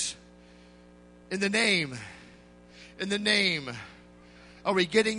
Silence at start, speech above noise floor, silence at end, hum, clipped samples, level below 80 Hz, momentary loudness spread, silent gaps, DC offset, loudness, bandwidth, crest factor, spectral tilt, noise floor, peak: 0 s; 26 dB; 0 s; 60 Hz at -55 dBFS; under 0.1%; -62 dBFS; 20 LU; none; under 0.1%; -27 LUFS; 10.5 kHz; 22 dB; -3 dB/octave; -54 dBFS; -8 dBFS